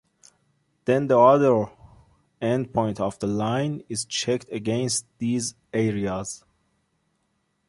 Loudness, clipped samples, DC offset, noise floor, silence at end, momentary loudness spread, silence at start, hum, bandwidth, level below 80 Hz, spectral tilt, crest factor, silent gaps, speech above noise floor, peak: -24 LUFS; under 0.1%; under 0.1%; -72 dBFS; 1.3 s; 13 LU; 0.85 s; none; 11.5 kHz; -58 dBFS; -5 dB/octave; 20 dB; none; 49 dB; -4 dBFS